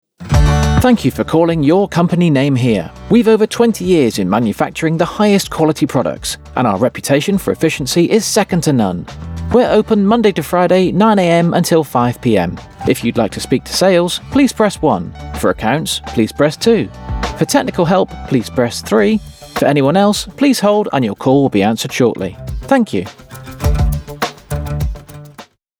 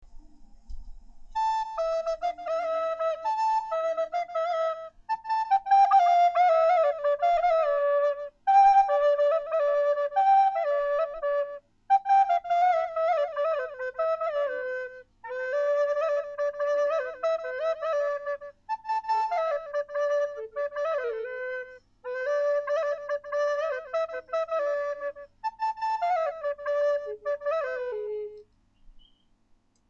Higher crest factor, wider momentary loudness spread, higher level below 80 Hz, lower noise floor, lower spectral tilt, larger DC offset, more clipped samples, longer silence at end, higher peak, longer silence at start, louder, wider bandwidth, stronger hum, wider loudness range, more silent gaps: about the same, 14 dB vs 14 dB; second, 10 LU vs 13 LU; first, -28 dBFS vs -56 dBFS; second, -40 dBFS vs -65 dBFS; first, -5.5 dB/octave vs -2 dB/octave; neither; neither; second, 0.35 s vs 1 s; first, 0 dBFS vs -12 dBFS; first, 0.2 s vs 0 s; first, -14 LUFS vs -26 LUFS; first, 19.5 kHz vs 7.4 kHz; neither; second, 3 LU vs 7 LU; neither